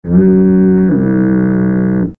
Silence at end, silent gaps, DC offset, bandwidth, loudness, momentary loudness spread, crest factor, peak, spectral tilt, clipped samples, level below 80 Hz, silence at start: 0.05 s; none; 1%; 2.3 kHz; -10 LUFS; 4 LU; 10 dB; 0 dBFS; -14 dB/octave; under 0.1%; -36 dBFS; 0.05 s